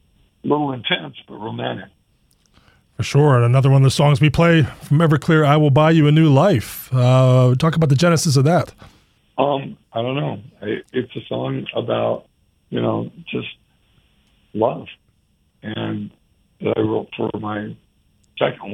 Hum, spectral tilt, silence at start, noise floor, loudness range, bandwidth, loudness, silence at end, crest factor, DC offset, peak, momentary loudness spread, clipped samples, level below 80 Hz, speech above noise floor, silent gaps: none; -6.5 dB/octave; 0.45 s; -62 dBFS; 12 LU; 14.5 kHz; -18 LUFS; 0 s; 18 dB; under 0.1%; 0 dBFS; 17 LU; under 0.1%; -48 dBFS; 45 dB; none